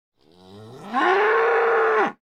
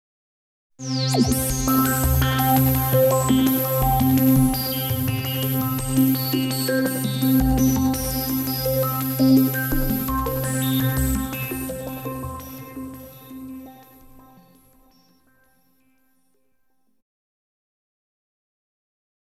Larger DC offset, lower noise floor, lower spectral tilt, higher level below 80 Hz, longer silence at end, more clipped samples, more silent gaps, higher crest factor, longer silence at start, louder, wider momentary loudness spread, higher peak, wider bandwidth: neither; second, -47 dBFS vs -72 dBFS; about the same, -4.5 dB/octave vs -5.5 dB/octave; second, -70 dBFS vs -34 dBFS; second, 0.25 s vs 5.5 s; neither; neither; about the same, 14 dB vs 18 dB; second, 0.5 s vs 0.8 s; about the same, -20 LUFS vs -21 LUFS; second, 8 LU vs 17 LU; about the same, -8 dBFS vs -6 dBFS; second, 8.4 kHz vs 17.5 kHz